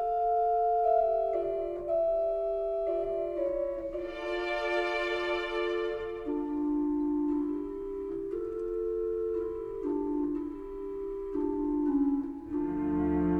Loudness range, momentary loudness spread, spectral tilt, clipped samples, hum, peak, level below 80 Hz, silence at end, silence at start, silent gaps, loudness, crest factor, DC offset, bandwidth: 4 LU; 9 LU; -7 dB/octave; under 0.1%; none; -16 dBFS; -52 dBFS; 0 s; 0 s; none; -31 LUFS; 14 dB; under 0.1%; 7.6 kHz